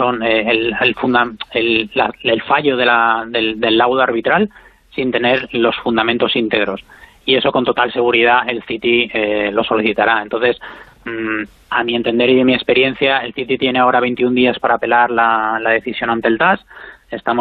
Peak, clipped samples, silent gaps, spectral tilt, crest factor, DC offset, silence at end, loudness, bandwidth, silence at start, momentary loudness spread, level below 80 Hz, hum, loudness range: -2 dBFS; under 0.1%; none; -7 dB/octave; 14 dB; under 0.1%; 0 s; -15 LUFS; 5.2 kHz; 0 s; 8 LU; -50 dBFS; none; 2 LU